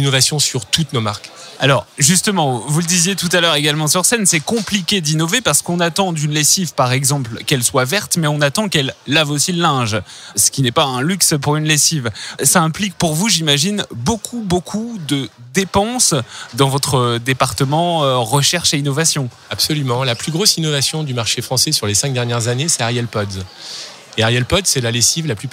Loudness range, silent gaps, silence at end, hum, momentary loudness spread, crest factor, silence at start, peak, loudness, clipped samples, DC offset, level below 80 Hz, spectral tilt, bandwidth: 3 LU; none; 0 s; none; 8 LU; 16 dB; 0 s; 0 dBFS; -15 LUFS; under 0.1%; under 0.1%; -46 dBFS; -3 dB/octave; 16.5 kHz